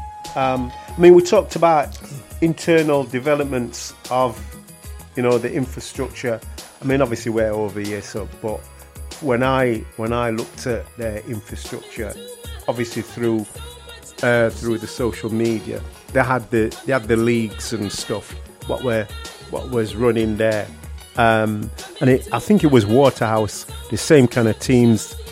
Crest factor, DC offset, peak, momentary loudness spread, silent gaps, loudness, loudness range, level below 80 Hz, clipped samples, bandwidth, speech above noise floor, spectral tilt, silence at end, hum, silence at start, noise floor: 20 dB; under 0.1%; 0 dBFS; 16 LU; none; -19 LUFS; 7 LU; -40 dBFS; under 0.1%; 16 kHz; 20 dB; -6 dB/octave; 0 s; none; 0 s; -39 dBFS